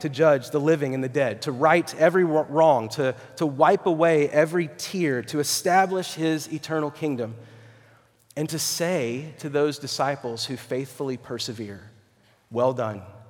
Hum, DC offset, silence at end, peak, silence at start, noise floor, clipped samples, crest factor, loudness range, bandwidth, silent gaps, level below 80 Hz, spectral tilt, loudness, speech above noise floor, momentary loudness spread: none; under 0.1%; 0.05 s; -4 dBFS; 0 s; -61 dBFS; under 0.1%; 20 dB; 8 LU; 19.5 kHz; none; -72 dBFS; -4.5 dB/octave; -24 LUFS; 37 dB; 12 LU